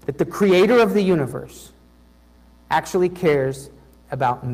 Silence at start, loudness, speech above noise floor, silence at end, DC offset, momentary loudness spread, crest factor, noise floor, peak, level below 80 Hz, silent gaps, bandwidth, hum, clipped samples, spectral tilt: 0.1 s; -19 LUFS; 33 dB; 0 s; under 0.1%; 19 LU; 16 dB; -51 dBFS; -6 dBFS; -50 dBFS; none; 15.5 kHz; 60 Hz at -50 dBFS; under 0.1%; -6.5 dB/octave